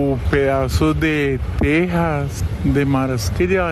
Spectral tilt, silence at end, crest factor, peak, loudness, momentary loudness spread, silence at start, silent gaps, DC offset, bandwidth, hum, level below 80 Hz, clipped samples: -6.5 dB/octave; 0 s; 12 dB; -6 dBFS; -18 LUFS; 4 LU; 0 s; none; under 0.1%; 13 kHz; none; -28 dBFS; under 0.1%